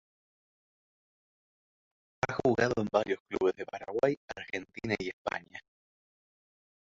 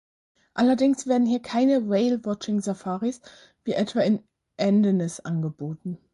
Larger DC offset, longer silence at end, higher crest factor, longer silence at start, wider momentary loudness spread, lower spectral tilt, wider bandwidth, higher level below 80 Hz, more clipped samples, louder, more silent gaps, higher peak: neither; first, 1.25 s vs 0.15 s; first, 22 dB vs 14 dB; first, 2.25 s vs 0.55 s; about the same, 11 LU vs 12 LU; about the same, -6 dB/octave vs -6.5 dB/octave; second, 7.8 kHz vs 11.5 kHz; about the same, -64 dBFS vs -68 dBFS; neither; second, -32 LUFS vs -24 LUFS; first, 3.20-3.25 s, 4.17-4.28 s, 5.13-5.25 s vs none; about the same, -12 dBFS vs -10 dBFS